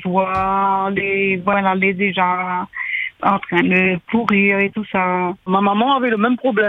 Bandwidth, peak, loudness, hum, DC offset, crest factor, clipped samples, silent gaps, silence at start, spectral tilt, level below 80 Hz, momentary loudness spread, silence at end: 4.9 kHz; 0 dBFS; -17 LUFS; none; under 0.1%; 18 dB; under 0.1%; none; 0 s; -8 dB/octave; -52 dBFS; 6 LU; 0 s